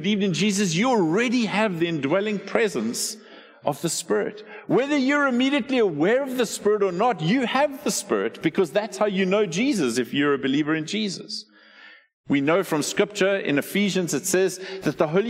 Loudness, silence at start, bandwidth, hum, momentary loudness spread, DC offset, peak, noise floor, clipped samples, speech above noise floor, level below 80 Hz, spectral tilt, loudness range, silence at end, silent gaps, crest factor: -23 LUFS; 0 s; 16 kHz; none; 6 LU; under 0.1%; -6 dBFS; -49 dBFS; under 0.1%; 27 dB; -68 dBFS; -4.5 dB/octave; 3 LU; 0 s; 12.13-12.24 s; 18 dB